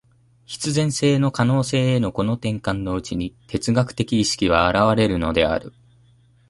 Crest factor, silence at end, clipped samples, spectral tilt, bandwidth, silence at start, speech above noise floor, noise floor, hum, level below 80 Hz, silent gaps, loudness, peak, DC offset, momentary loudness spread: 18 dB; 0.8 s; under 0.1%; -5.5 dB/octave; 11.5 kHz; 0.5 s; 35 dB; -55 dBFS; none; -42 dBFS; none; -21 LUFS; -2 dBFS; under 0.1%; 10 LU